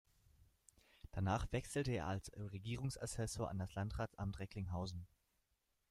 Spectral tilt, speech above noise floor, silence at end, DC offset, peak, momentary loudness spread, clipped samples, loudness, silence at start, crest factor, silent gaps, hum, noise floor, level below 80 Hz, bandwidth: -5.5 dB/octave; 41 dB; 0.85 s; under 0.1%; -26 dBFS; 9 LU; under 0.1%; -44 LUFS; 1.15 s; 20 dB; none; none; -84 dBFS; -58 dBFS; 14 kHz